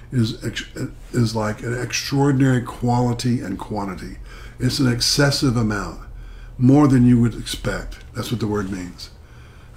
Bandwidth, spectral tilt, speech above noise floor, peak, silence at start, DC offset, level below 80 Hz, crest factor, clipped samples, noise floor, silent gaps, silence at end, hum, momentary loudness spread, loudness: 16 kHz; -5.5 dB/octave; 22 dB; -4 dBFS; 0 s; under 0.1%; -38 dBFS; 16 dB; under 0.1%; -42 dBFS; none; 0.05 s; none; 19 LU; -20 LUFS